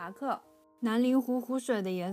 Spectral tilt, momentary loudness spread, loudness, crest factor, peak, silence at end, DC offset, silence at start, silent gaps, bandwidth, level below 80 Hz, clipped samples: -6 dB/octave; 9 LU; -31 LUFS; 14 dB; -18 dBFS; 0 s; under 0.1%; 0 s; none; 15.5 kHz; -84 dBFS; under 0.1%